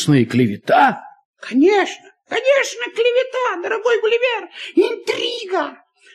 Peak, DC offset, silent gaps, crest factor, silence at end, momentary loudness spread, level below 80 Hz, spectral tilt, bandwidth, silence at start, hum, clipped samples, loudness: -2 dBFS; under 0.1%; 1.25-1.34 s; 16 dB; 0.4 s; 10 LU; -66 dBFS; -5 dB/octave; 13.5 kHz; 0 s; none; under 0.1%; -18 LUFS